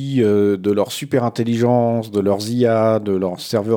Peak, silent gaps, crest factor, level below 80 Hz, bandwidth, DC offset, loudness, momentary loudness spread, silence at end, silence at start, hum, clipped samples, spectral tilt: -4 dBFS; none; 14 dB; -66 dBFS; 18 kHz; under 0.1%; -18 LUFS; 5 LU; 0 s; 0 s; none; under 0.1%; -6.5 dB/octave